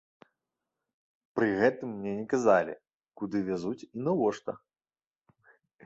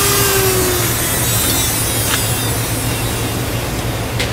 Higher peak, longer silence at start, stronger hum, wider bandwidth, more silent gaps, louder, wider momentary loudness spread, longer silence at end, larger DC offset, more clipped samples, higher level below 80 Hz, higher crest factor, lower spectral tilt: second, -10 dBFS vs 0 dBFS; first, 1.35 s vs 0 s; neither; second, 8 kHz vs 16 kHz; first, 2.94-3.00 s vs none; second, -30 LUFS vs -15 LUFS; first, 15 LU vs 7 LU; first, 1.3 s vs 0 s; neither; neither; second, -70 dBFS vs -30 dBFS; first, 22 dB vs 16 dB; first, -6.5 dB/octave vs -3 dB/octave